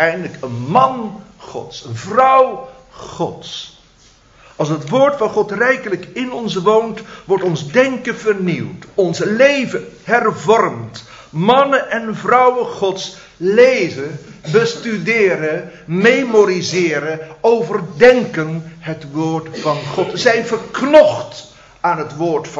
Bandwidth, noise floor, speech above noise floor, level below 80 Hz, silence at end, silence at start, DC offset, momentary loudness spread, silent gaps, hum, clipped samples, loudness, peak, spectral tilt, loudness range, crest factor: 8 kHz; -48 dBFS; 33 dB; -54 dBFS; 0 s; 0 s; under 0.1%; 17 LU; none; none; under 0.1%; -15 LUFS; 0 dBFS; -5.5 dB/octave; 4 LU; 16 dB